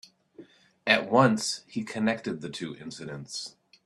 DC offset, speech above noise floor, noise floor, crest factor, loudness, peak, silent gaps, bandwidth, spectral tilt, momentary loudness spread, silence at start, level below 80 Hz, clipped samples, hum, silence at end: under 0.1%; 25 dB; -53 dBFS; 24 dB; -27 LUFS; -4 dBFS; none; 12.5 kHz; -4.5 dB/octave; 17 LU; 0.4 s; -70 dBFS; under 0.1%; none; 0.35 s